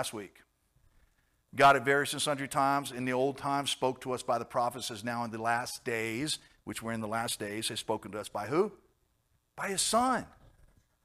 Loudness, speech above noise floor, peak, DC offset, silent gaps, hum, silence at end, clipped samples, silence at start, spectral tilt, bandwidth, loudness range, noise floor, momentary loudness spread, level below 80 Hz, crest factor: -31 LUFS; 43 dB; -12 dBFS; under 0.1%; none; none; 0.75 s; under 0.1%; 0 s; -3.5 dB/octave; 15.5 kHz; 6 LU; -74 dBFS; 11 LU; -66 dBFS; 20 dB